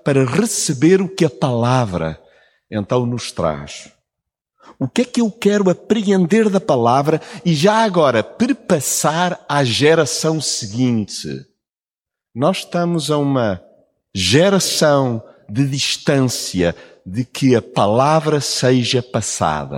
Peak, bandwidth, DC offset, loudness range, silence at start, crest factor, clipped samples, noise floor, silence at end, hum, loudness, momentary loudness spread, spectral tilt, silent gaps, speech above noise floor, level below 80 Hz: -2 dBFS; 17 kHz; under 0.1%; 5 LU; 0.05 s; 16 dB; under 0.1%; under -90 dBFS; 0 s; none; -17 LUFS; 12 LU; -5 dB/octave; none; over 74 dB; -50 dBFS